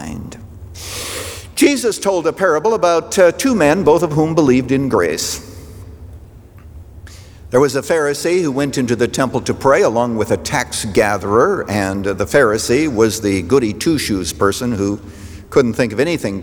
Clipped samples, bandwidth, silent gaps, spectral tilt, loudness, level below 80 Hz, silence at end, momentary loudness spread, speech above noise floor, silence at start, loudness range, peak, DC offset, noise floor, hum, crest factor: under 0.1%; over 20 kHz; none; -5 dB/octave; -15 LUFS; -42 dBFS; 0 s; 14 LU; 24 dB; 0 s; 5 LU; -2 dBFS; under 0.1%; -38 dBFS; none; 14 dB